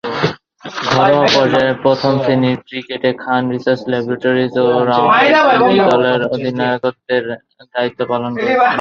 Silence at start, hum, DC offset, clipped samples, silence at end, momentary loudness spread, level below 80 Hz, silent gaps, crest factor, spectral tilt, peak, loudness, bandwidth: 0.05 s; none; under 0.1%; under 0.1%; 0 s; 10 LU; -54 dBFS; none; 14 dB; -6 dB/octave; 0 dBFS; -14 LUFS; 7.2 kHz